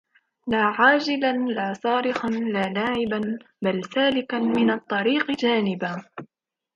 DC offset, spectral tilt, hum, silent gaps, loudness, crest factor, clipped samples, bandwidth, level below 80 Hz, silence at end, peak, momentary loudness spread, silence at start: under 0.1%; -6 dB/octave; none; none; -23 LUFS; 18 dB; under 0.1%; 7.6 kHz; -62 dBFS; 0.5 s; -6 dBFS; 11 LU; 0.45 s